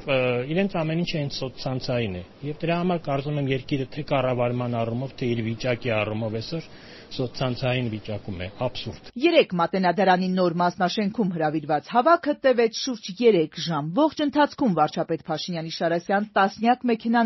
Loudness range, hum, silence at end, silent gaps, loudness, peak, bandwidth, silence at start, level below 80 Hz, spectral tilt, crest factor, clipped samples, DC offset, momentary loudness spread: 6 LU; none; 0 s; none; -24 LUFS; -4 dBFS; 6.2 kHz; 0 s; -52 dBFS; -4.5 dB/octave; 20 dB; under 0.1%; under 0.1%; 10 LU